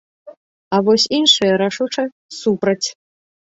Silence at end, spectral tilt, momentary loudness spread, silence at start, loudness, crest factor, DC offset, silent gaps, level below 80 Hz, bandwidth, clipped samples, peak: 0.7 s; -3.5 dB/octave; 11 LU; 0.25 s; -16 LUFS; 18 dB; under 0.1%; 0.37-0.71 s, 2.12-2.29 s; -62 dBFS; 8 kHz; under 0.1%; 0 dBFS